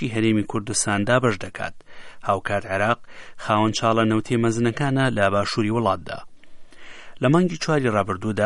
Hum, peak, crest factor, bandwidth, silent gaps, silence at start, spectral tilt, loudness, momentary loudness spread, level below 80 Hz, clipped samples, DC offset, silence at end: none; -4 dBFS; 18 dB; 11.5 kHz; none; 0 s; -5 dB/octave; -22 LUFS; 10 LU; -50 dBFS; under 0.1%; under 0.1%; 0 s